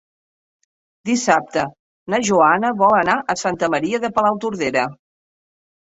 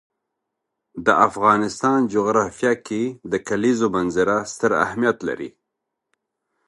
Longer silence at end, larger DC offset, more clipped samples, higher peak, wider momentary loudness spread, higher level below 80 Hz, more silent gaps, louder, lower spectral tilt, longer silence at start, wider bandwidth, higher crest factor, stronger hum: second, 0.9 s vs 1.2 s; neither; neither; about the same, -2 dBFS vs 0 dBFS; about the same, 9 LU vs 10 LU; about the same, -58 dBFS vs -56 dBFS; first, 1.79-2.06 s vs none; about the same, -18 LUFS vs -20 LUFS; about the same, -4 dB/octave vs -5 dB/octave; about the same, 1.05 s vs 0.95 s; second, 8.2 kHz vs 11.5 kHz; about the same, 18 dB vs 22 dB; neither